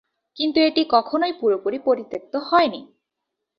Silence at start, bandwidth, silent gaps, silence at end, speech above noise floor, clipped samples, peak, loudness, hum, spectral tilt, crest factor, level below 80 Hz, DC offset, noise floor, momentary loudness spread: 0.35 s; 6 kHz; none; 0.75 s; 61 dB; under 0.1%; -4 dBFS; -21 LUFS; none; -6 dB/octave; 18 dB; -66 dBFS; under 0.1%; -81 dBFS; 9 LU